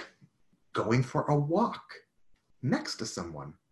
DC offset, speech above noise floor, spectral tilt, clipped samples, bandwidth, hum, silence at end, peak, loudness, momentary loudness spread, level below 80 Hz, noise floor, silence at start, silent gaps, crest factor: under 0.1%; 36 dB; -6 dB/octave; under 0.1%; 12 kHz; none; 0.2 s; -14 dBFS; -31 LUFS; 18 LU; -62 dBFS; -66 dBFS; 0 s; none; 20 dB